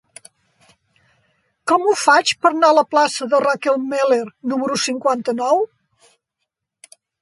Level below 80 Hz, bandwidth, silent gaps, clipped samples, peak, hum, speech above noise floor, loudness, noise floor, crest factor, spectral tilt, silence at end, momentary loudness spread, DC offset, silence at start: -72 dBFS; 11.5 kHz; none; under 0.1%; 0 dBFS; none; 61 dB; -17 LUFS; -78 dBFS; 18 dB; -2.5 dB/octave; 1.55 s; 7 LU; under 0.1%; 1.65 s